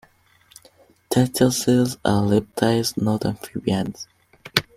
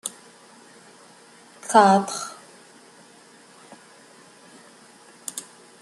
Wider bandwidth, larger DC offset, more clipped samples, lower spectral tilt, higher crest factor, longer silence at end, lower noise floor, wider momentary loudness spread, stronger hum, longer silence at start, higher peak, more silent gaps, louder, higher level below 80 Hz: first, 16 kHz vs 13 kHz; neither; neither; about the same, -5 dB/octave vs -4 dB/octave; about the same, 20 dB vs 24 dB; second, 0.15 s vs 0.4 s; first, -57 dBFS vs -51 dBFS; second, 9 LU vs 26 LU; neither; first, 1.1 s vs 0.05 s; about the same, -2 dBFS vs -2 dBFS; neither; about the same, -21 LUFS vs -21 LUFS; first, -52 dBFS vs -76 dBFS